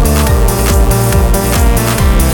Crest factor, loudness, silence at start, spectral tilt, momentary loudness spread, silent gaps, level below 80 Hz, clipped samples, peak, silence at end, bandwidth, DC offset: 8 dB; -11 LUFS; 0 s; -5 dB/octave; 1 LU; none; -12 dBFS; under 0.1%; 0 dBFS; 0 s; over 20 kHz; under 0.1%